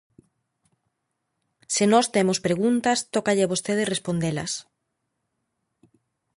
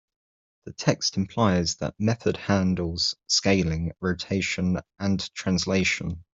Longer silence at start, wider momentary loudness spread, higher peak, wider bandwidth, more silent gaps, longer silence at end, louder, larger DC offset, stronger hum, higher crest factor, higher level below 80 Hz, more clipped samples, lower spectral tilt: first, 1.7 s vs 0.65 s; about the same, 8 LU vs 6 LU; about the same, -6 dBFS vs -4 dBFS; first, 11.5 kHz vs 7.8 kHz; neither; first, 1.75 s vs 0.15 s; about the same, -23 LUFS vs -25 LUFS; neither; neither; about the same, 20 dB vs 20 dB; second, -62 dBFS vs -50 dBFS; neither; about the same, -4 dB/octave vs -4.5 dB/octave